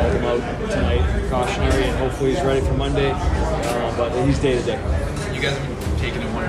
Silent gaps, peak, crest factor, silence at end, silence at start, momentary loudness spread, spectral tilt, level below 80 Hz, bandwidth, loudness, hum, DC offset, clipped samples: none; -6 dBFS; 14 dB; 0 s; 0 s; 4 LU; -6 dB/octave; -26 dBFS; 13.5 kHz; -21 LUFS; none; under 0.1%; under 0.1%